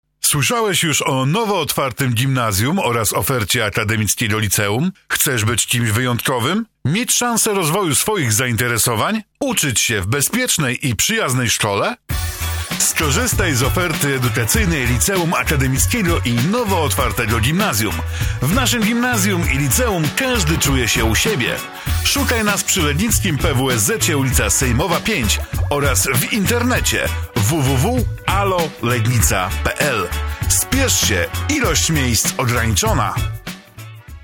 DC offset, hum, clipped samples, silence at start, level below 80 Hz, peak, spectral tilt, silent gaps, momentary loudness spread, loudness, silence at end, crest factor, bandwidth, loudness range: under 0.1%; none; under 0.1%; 0.25 s; -28 dBFS; -2 dBFS; -3.5 dB/octave; none; 5 LU; -16 LUFS; 0 s; 16 dB; 17.5 kHz; 1 LU